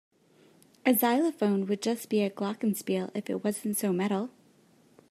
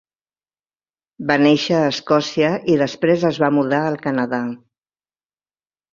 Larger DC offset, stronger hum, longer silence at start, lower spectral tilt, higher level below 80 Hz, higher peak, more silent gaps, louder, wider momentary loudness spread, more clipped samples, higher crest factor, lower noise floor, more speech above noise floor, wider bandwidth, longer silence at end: neither; neither; second, 0.85 s vs 1.2 s; about the same, -5 dB/octave vs -6 dB/octave; second, -82 dBFS vs -60 dBFS; second, -10 dBFS vs -2 dBFS; neither; second, -29 LUFS vs -18 LUFS; about the same, 7 LU vs 9 LU; neither; about the same, 20 dB vs 18 dB; second, -62 dBFS vs under -90 dBFS; second, 34 dB vs over 73 dB; first, 15.5 kHz vs 7.4 kHz; second, 0.8 s vs 1.35 s